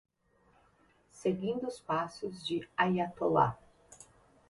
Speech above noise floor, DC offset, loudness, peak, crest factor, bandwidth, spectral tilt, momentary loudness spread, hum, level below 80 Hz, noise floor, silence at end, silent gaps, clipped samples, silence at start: 37 dB; under 0.1%; -33 LUFS; -14 dBFS; 22 dB; 11.5 kHz; -6 dB/octave; 10 LU; none; -66 dBFS; -69 dBFS; 0.45 s; none; under 0.1%; 1.15 s